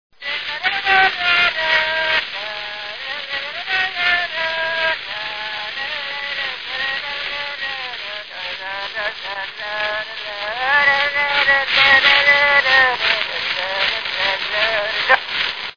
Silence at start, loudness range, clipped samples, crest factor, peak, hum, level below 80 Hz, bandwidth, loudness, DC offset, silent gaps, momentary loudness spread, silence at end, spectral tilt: 0.2 s; 11 LU; under 0.1%; 18 dB; 0 dBFS; none; -54 dBFS; 5.4 kHz; -17 LUFS; 0.4%; none; 14 LU; 0 s; -1.5 dB/octave